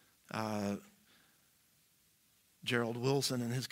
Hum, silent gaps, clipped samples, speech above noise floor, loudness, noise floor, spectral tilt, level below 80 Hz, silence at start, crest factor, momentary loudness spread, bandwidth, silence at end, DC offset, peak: none; none; under 0.1%; 36 dB; -37 LUFS; -71 dBFS; -4.5 dB/octave; -80 dBFS; 0.3 s; 22 dB; 10 LU; 16 kHz; 0.05 s; under 0.1%; -18 dBFS